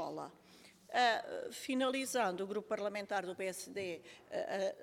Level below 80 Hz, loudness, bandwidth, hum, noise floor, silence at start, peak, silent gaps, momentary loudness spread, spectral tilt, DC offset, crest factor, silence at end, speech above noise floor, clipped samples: -82 dBFS; -38 LUFS; 17 kHz; none; -62 dBFS; 0 s; -20 dBFS; none; 11 LU; -3 dB/octave; under 0.1%; 20 dB; 0 s; 24 dB; under 0.1%